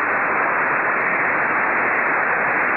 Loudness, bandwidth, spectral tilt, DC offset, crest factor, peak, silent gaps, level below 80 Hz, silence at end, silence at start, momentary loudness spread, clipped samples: -18 LUFS; 5.2 kHz; -9 dB/octave; 0.1%; 10 dB; -8 dBFS; none; -62 dBFS; 0 s; 0 s; 1 LU; under 0.1%